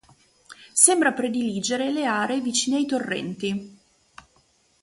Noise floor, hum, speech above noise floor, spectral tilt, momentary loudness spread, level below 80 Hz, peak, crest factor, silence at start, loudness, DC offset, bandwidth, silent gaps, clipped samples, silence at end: -63 dBFS; none; 40 dB; -2.5 dB/octave; 13 LU; -66 dBFS; 0 dBFS; 24 dB; 0.5 s; -22 LUFS; under 0.1%; 12 kHz; none; under 0.1%; 1.1 s